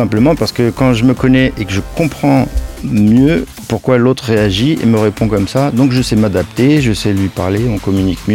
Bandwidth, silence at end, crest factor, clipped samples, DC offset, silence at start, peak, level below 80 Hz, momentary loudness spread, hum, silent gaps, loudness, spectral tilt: 17 kHz; 0 s; 12 dB; under 0.1%; 0.3%; 0 s; 0 dBFS; -28 dBFS; 7 LU; none; none; -12 LUFS; -6.5 dB/octave